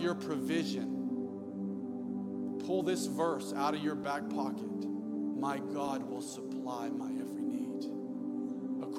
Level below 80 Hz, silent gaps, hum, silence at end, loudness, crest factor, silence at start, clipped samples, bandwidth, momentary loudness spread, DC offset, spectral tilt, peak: -82 dBFS; none; none; 0 s; -37 LUFS; 16 dB; 0 s; under 0.1%; 15.5 kHz; 6 LU; under 0.1%; -5.5 dB/octave; -20 dBFS